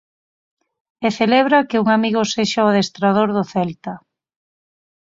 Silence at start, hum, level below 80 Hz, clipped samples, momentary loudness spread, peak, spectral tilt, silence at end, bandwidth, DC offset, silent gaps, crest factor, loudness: 1 s; none; -60 dBFS; under 0.1%; 10 LU; -2 dBFS; -5 dB/octave; 1.05 s; 7.8 kHz; under 0.1%; none; 18 dB; -17 LUFS